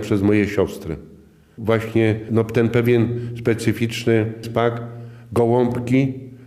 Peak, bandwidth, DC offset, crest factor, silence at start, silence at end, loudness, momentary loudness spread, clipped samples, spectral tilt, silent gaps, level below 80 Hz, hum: -4 dBFS; 15 kHz; under 0.1%; 16 dB; 0 s; 0 s; -20 LUFS; 12 LU; under 0.1%; -7.5 dB/octave; none; -52 dBFS; none